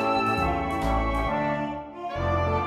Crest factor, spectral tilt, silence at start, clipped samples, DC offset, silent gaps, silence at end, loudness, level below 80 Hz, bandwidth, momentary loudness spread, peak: 12 dB; -7 dB/octave; 0 s; under 0.1%; under 0.1%; none; 0 s; -26 LUFS; -36 dBFS; 14.5 kHz; 9 LU; -12 dBFS